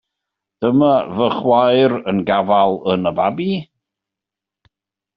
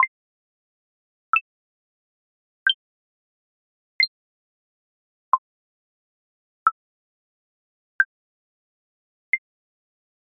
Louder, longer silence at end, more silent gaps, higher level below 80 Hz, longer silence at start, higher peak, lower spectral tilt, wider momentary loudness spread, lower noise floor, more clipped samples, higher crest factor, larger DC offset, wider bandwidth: first, -16 LUFS vs -24 LUFS; first, 1.55 s vs 0.95 s; second, none vs 0.08-1.33 s, 1.41-2.66 s, 2.74-3.99 s, 4.08-5.32 s, 5.38-6.66 s, 6.72-7.99 s, 8.05-9.33 s; first, -58 dBFS vs -78 dBFS; first, 0.6 s vs 0 s; about the same, -2 dBFS vs -4 dBFS; first, -5 dB/octave vs 10.5 dB/octave; first, 8 LU vs 3 LU; second, -86 dBFS vs under -90 dBFS; neither; second, 14 dB vs 28 dB; neither; first, 5.4 kHz vs 1.9 kHz